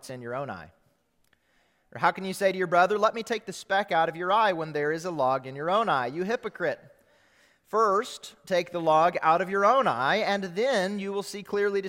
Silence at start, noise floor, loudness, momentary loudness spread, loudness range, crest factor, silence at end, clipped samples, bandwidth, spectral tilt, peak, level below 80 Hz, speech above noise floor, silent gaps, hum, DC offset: 0.05 s; -69 dBFS; -26 LUFS; 12 LU; 4 LU; 20 dB; 0 s; under 0.1%; 16.5 kHz; -4.5 dB/octave; -8 dBFS; -70 dBFS; 42 dB; none; none; under 0.1%